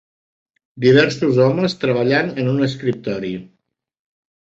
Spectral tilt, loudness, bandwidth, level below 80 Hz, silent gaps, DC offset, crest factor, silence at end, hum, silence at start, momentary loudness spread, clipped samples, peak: -6.5 dB/octave; -17 LUFS; 7.8 kHz; -58 dBFS; none; under 0.1%; 16 dB; 0.95 s; none; 0.75 s; 11 LU; under 0.1%; -2 dBFS